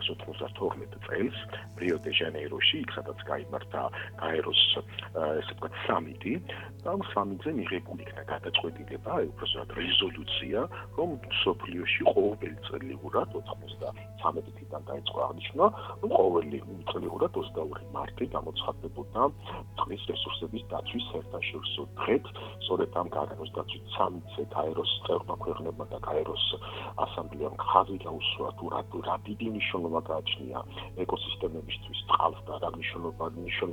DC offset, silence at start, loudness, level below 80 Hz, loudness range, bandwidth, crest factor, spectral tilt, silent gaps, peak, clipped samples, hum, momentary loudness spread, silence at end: under 0.1%; 0 s; -31 LUFS; -56 dBFS; 5 LU; 19 kHz; 28 dB; -6 dB/octave; none; -4 dBFS; under 0.1%; 50 Hz at -45 dBFS; 12 LU; 0 s